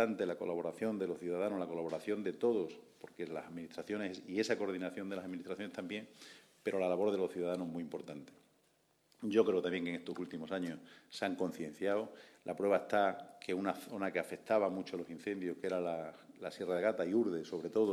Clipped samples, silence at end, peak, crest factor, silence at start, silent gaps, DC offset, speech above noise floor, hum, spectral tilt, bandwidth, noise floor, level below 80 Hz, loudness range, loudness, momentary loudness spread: under 0.1%; 0 s; -16 dBFS; 22 dB; 0 s; none; under 0.1%; 37 dB; none; -6 dB/octave; 14 kHz; -74 dBFS; -82 dBFS; 3 LU; -38 LUFS; 13 LU